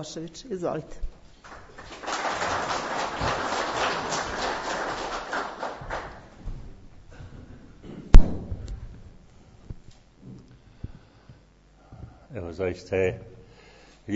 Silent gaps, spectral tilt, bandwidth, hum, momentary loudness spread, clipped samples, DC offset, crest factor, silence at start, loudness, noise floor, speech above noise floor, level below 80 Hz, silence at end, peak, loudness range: none; -4 dB/octave; 8 kHz; none; 21 LU; under 0.1%; under 0.1%; 26 dB; 0 s; -29 LUFS; -56 dBFS; 26 dB; -28 dBFS; 0 s; 0 dBFS; 16 LU